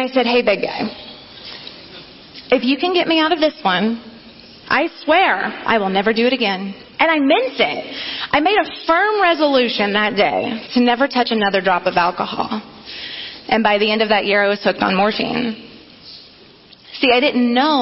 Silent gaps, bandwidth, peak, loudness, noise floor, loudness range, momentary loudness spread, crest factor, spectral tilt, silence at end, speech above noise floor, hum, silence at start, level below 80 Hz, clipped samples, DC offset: none; 6 kHz; -4 dBFS; -16 LUFS; -45 dBFS; 3 LU; 18 LU; 14 dB; -7.5 dB/octave; 0 s; 29 dB; none; 0 s; -56 dBFS; under 0.1%; under 0.1%